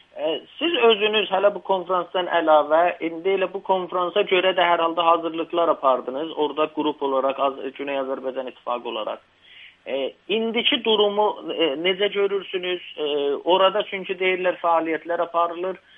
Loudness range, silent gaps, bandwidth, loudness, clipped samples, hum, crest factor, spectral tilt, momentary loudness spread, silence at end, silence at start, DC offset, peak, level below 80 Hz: 6 LU; none; 3.9 kHz; -22 LUFS; under 0.1%; none; 18 dB; -7 dB/octave; 10 LU; 0.2 s; 0.15 s; under 0.1%; -4 dBFS; -76 dBFS